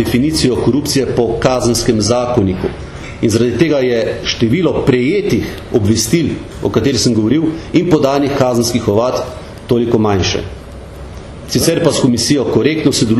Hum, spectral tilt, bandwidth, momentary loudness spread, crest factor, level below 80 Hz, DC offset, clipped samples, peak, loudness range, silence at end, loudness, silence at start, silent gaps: none; -5 dB/octave; 13.5 kHz; 9 LU; 14 dB; -34 dBFS; under 0.1%; under 0.1%; 0 dBFS; 2 LU; 0 s; -13 LUFS; 0 s; none